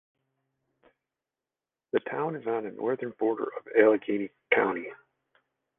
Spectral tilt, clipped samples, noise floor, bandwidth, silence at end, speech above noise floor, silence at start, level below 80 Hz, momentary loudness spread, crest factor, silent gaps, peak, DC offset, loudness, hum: -9 dB/octave; under 0.1%; under -90 dBFS; 3.8 kHz; 0.85 s; over 62 dB; 1.95 s; -74 dBFS; 10 LU; 24 dB; none; -6 dBFS; under 0.1%; -28 LUFS; none